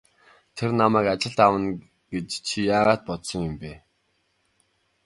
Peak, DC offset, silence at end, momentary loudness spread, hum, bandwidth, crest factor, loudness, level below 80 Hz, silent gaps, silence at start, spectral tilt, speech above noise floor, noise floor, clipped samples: -2 dBFS; under 0.1%; 1.3 s; 16 LU; none; 11.5 kHz; 22 dB; -23 LUFS; -54 dBFS; none; 0.55 s; -5 dB/octave; 47 dB; -70 dBFS; under 0.1%